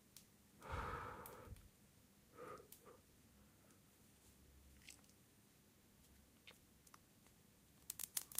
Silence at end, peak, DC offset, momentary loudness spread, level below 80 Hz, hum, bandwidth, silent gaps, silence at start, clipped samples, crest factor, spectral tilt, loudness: 0 s; -20 dBFS; under 0.1%; 20 LU; -68 dBFS; none; 15.5 kHz; none; 0 s; under 0.1%; 36 dB; -2.5 dB/octave; -54 LUFS